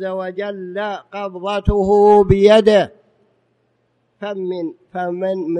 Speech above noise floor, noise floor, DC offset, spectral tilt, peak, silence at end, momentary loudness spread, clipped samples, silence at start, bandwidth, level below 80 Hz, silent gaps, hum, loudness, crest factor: 48 dB; -64 dBFS; under 0.1%; -7 dB/octave; 0 dBFS; 0 s; 16 LU; under 0.1%; 0 s; 9.4 kHz; -34 dBFS; none; none; -16 LUFS; 16 dB